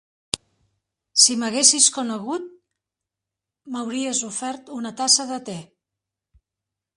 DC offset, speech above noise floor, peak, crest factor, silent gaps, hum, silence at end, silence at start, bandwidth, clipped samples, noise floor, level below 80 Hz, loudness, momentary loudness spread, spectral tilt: under 0.1%; 65 dB; 0 dBFS; 24 dB; none; none; 1.35 s; 0.35 s; 11.5 kHz; under 0.1%; -86 dBFS; -68 dBFS; -19 LUFS; 16 LU; -0.5 dB/octave